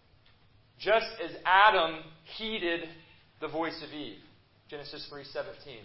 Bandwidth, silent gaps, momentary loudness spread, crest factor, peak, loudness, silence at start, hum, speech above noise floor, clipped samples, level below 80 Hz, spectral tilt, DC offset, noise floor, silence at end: 5.8 kHz; none; 22 LU; 24 dB; -8 dBFS; -29 LUFS; 0.8 s; none; 31 dB; under 0.1%; -64 dBFS; -7 dB/octave; under 0.1%; -62 dBFS; 0 s